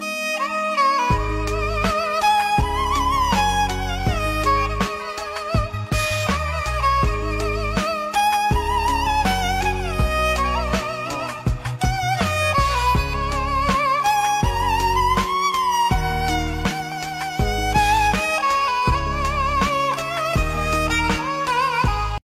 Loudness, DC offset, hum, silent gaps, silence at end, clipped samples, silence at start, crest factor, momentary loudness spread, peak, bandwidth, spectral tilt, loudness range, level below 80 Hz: -20 LUFS; under 0.1%; none; none; 0.15 s; under 0.1%; 0 s; 14 dB; 5 LU; -6 dBFS; 16 kHz; -4.5 dB/octave; 2 LU; -28 dBFS